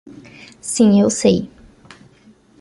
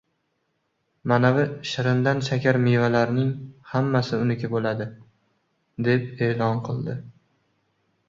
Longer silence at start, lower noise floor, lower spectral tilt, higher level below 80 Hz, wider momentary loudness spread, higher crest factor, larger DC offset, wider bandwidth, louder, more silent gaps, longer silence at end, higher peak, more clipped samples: second, 0.05 s vs 1.05 s; second, -50 dBFS vs -73 dBFS; second, -5.5 dB/octave vs -7.5 dB/octave; first, -50 dBFS vs -60 dBFS; first, 18 LU vs 12 LU; about the same, 18 dB vs 20 dB; neither; first, 11.5 kHz vs 7.4 kHz; first, -15 LUFS vs -23 LUFS; neither; first, 1.15 s vs 0.95 s; first, -2 dBFS vs -6 dBFS; neither